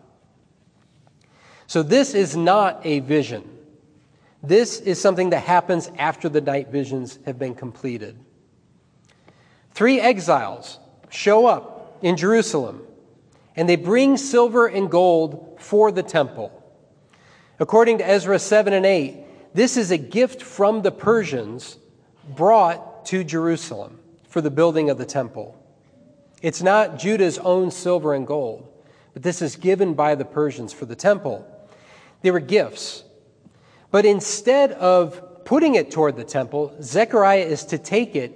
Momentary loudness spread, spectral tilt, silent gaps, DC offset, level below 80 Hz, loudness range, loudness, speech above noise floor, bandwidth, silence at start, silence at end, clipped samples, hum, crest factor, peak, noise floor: 16 LU; -5 dB/octave; none; under 0.1%; -70 dBFS; 5 LU; -19 LUFS; 39 dB; 10.5 kHz; 1.7 s; 0.05 s; under 0.1%; none; 18 dB; -2 dBFS; -58 dBFS